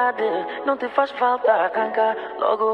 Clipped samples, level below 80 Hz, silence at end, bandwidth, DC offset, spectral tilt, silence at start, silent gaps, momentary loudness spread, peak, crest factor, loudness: under 0.1%; -68 dBFS; 0 s; 5.8 kHz; under 0.1%; -5.5 dB/octave; 0 s; none; 5 LU; -4 dBFS; 16 dB; -21 LUFS